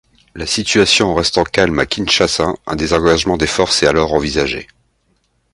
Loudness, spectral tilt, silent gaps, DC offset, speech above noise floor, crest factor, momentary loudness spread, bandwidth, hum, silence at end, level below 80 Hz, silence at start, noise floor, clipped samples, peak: -14 LUFS; -3.5 dB/octave; none; under 0.1%; 47 dB; 16 dB; 8 LU; 11.5 kHz; none; 0.9 s; -34 dBFS; 0.35 s; -61 dBFS; under 0.1%; 0 dBFS